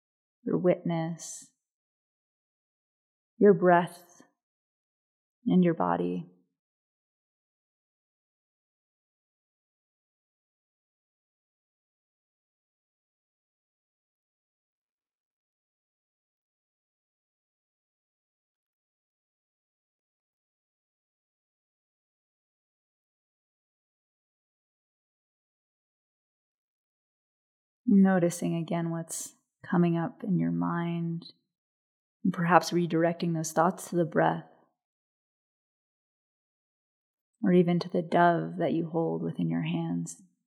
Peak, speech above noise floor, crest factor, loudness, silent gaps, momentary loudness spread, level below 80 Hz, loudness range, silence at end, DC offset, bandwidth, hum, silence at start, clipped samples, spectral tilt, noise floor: -4 dBFS; over 63 dB; 28 dB; -27 LUFS; 1.74-3.37 s, 4.43-5.42 s, 6.59-14.98 s, 15.14-27.84 s, 31.58-32.20 s, 34.85-37.33 s; 13 LU; -88 dBFS; 7 LU; 0.35 s; under 0.1%; 14 kHz; none; 0.45 s; under 0.1%; -6.5 dB/octave; under -90 dBFS